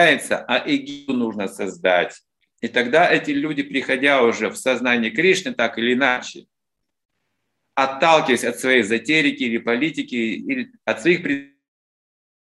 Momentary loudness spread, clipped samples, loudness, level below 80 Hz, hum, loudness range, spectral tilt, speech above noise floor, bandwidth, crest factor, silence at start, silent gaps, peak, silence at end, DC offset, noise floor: 10 LU; under 0.1%; -19 LUFS; -68 dBFS; none; 3 LU; -4 dB/octave; 62 dB; 12.5 kHz; 20 dB; 0 s; 7.05-7.09 s; 0 dBFS; 1.15 s; under 0.1%; -81 dBFS